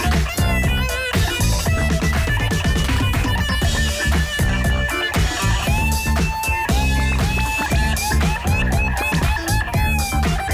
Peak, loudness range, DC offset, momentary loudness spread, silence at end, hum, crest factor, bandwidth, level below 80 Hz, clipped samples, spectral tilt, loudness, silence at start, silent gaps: -10 dBFS; 0 LU; under 0.1%; 1 LU; 0 s; none; 8 dB; 19.5 kHz; -22 dBFS; under 0.1%; -4.5 dB/octave; -19 LUFS; 0 s; none